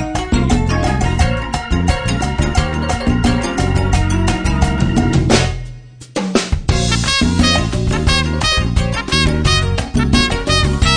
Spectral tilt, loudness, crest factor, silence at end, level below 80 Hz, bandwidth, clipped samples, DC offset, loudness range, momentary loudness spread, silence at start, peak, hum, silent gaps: -5 dB/octave; -15 LUFS; 14 dB; 0 s; -20 dBFS; 10.5 kHz; under 0.1%; 0.4%; 2 LU; 5 LU; 0 s; 0 dBFS; none; none